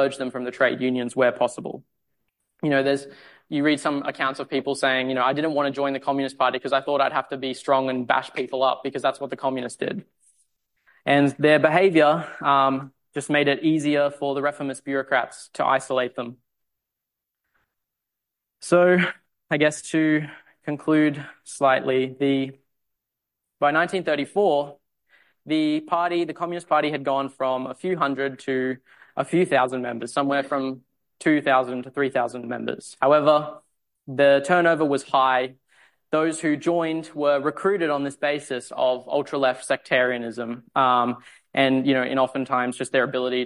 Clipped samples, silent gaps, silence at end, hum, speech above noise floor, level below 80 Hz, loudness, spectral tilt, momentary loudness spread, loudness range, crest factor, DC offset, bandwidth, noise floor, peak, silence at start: under 0.1%; none; 0 s; none; 62 dB; -72 dBFS; -23 LUFS; -5 dB/octave; 11 LU; 5 LU; 18 dB; under 0.1%; 11.5 kHz; -84 dBFS; -4 dBFS; 0 s